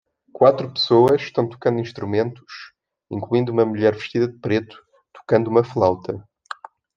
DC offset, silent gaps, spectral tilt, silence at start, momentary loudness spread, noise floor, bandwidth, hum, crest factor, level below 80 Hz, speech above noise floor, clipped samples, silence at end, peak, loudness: under 0.1%; none; -7.5 dB/octave; 0.35 s; 20 LU; -38 dBFS; 7.4 kHz; none; 18 dB; -62 dBFS; 19 dB; under 0.1%; 0.75 s; -2 dBFS; -20 LUFS